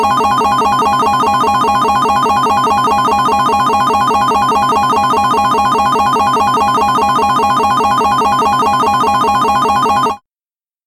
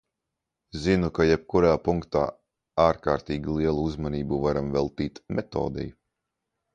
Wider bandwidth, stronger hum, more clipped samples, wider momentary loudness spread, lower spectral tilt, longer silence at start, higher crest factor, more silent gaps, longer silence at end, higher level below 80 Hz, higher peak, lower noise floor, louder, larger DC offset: first, 17 kHz vs 9.2 kHz; neither; neither; second, 0 LU vs 10 LU; second, -4 dB/octave vs -7.5 dB/octave; second, 0 s vs 0.75 s; second, 10 dB vs 20 dB; neither; second, 0.7 s vs 0.85 s; about the same, -40 dBFS vs -44 dBFS; first, -2 dBFS vs -6 dBFS; first, under -90 dBFS vs -85 dBFS; first, -11 LUFS vs -26 LUFS; neither